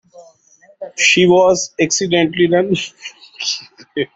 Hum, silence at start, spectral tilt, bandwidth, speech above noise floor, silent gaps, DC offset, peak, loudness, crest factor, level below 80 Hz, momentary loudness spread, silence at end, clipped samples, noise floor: none; 0.15 s; -3.5 dB/octave; 8 kHz; 36 dB; none; under 0.1%; -2 dBFS; -14 LUFS; 16 dB; -56 dBFS; 19 LU; 0.1 s; under 0.1%; -51 dBFS